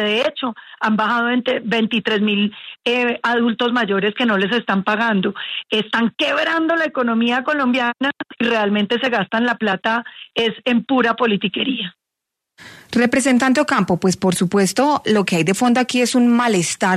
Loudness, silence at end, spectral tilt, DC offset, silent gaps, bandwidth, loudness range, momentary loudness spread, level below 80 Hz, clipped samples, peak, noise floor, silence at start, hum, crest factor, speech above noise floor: -18 LUFS; 0 s; -4.5 dB/octave; under 0.1%; none; 13.5 kHz; 3 LU; 6 LU; -60 dBFS; under 0.1%; -2 dBFS; -82 dBFS; 0 s; none; 14 dB; 64 dB